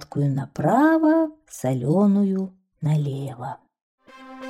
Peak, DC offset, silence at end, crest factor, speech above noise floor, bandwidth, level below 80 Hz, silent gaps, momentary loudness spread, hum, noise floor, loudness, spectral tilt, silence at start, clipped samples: -8 dBFS; under 0.1%; 0 s; 14 dB; 19 dB; 14.5 kHz; -62 dBFS; 3.82-3.98 s; 16 LU; none; -40 dBFS; -22 LUFS; -8 dB/octave; 0 s; under 0.1%